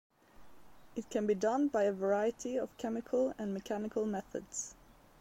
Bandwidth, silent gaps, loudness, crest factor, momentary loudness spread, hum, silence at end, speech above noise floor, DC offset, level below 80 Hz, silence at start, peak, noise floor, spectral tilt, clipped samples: 16.5 kHz; none; -35 LUFS; 16 dB; 10 LU; none; 0.45 s; 26 dB; under 0.1%; -66 dBFS; 0.4 s; -20 dBFS; -61 dBFS; -5 dB/octave; under 0.1%